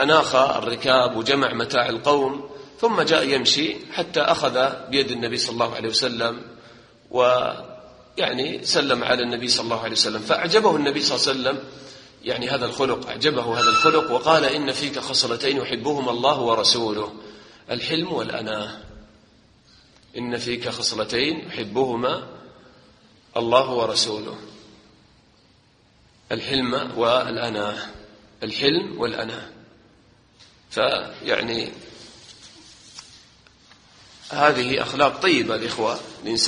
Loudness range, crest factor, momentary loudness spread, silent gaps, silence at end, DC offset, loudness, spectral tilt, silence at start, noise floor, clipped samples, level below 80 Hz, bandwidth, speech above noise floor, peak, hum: 8 LU; 22 dB; 15 LU; none; 0 s; under 0.1%; -21 LUFS; -3 dB/octave; 0 s; -57 dBFS; under 0.1%; -58 dBFS; 10 kHz; 35 dB; 0 dBFS; none